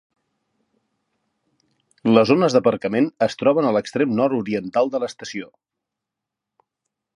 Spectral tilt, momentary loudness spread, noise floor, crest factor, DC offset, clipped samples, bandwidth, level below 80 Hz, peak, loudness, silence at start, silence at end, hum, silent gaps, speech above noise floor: -6 dB/octave; 11 LU; -84 dBFS; 22 dB; under 0.1%; under 0.1%; 11 kHz; -64 dBFS; 0 dBFS; -19 LUFS; 2.05 s; 1.7 s; none; none; 65 dB